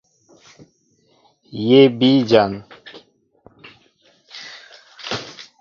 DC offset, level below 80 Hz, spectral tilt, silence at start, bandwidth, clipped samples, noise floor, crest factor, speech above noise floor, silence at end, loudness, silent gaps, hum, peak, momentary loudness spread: under 0.1%; -60 dBFS; -6.5 dB/octave; 1.55 s; 7.2 kHz; under 0.1%; -60 dBFS; 20 dB; 47 dB; 0.2 s; -16 LUFS; none; none; 0 dBFS; 27 LU